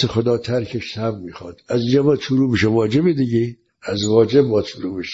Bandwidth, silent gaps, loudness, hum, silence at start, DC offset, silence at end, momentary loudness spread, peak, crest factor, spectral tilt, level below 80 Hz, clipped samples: 7.8 kHz; none; -18 LUFS; none; 0 s; under 0.1%; 0 s; 11 LU; -2 dBFS; 16 dB; -6.5 dB/octave; -52 dBFS; under 0.1%